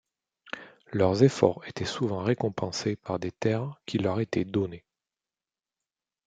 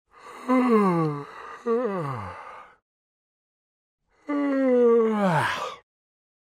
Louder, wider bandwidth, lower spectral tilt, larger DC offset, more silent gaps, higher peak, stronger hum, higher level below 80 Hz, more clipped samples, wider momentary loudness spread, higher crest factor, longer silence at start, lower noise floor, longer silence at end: second, -28 LUFS vs -23 LUFS; second, 9.2 kHz vs 13 kHz; about the same, -6.5 dB/octave vs -7 dB/octave; neither; second, none vs 2.82-3.98 s; first, -6 dBFS vs -10 dBFS; neither; first, -64 dBFS vs -70 dBFS; neither; about the same, 16 LU vs 18 LU; first, 24 dB vs 16 dB; first, 0.45 s vs 0.25 s; first, under -90 dBFS vs -43 dBFS; first, 1.45 s vs 0.75 s